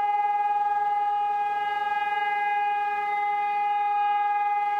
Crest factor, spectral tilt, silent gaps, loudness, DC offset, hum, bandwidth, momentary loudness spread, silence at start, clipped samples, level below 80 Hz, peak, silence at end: 8 dB; -2 dB/octave; none; -25 LUFS; under 0.1%; none; 5.6 kHz; 2 LU; 0 s; under 0.1%; -68 dBFS; -16 dBFS; 0 s